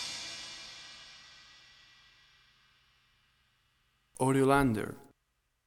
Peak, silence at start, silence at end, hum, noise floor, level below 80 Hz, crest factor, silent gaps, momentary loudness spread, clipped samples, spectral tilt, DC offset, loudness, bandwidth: -12 dBFS; 0 s; 0.65 s; none; -79 dBFS; -58 dBFS; 24 dB; none; 27 LU; under 0.1%; -5.5 dB/octave; under 0.1%; -31 LUFS; 16.5 kHz